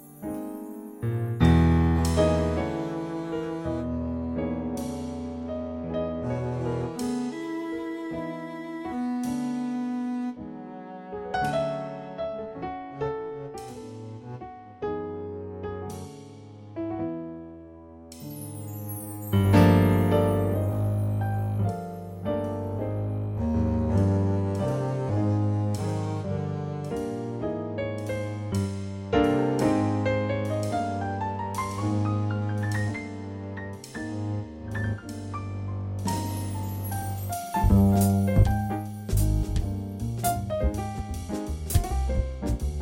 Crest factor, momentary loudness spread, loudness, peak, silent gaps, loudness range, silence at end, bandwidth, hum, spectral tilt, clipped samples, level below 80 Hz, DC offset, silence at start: 20 dB; 15 LU; -28 LUFS; -6 dBFS; none; 11 LU; 0 s; 18 kHz; none; -7 dB/octave; under 0.1%; -38 dBFS; under 0.1%; 0 s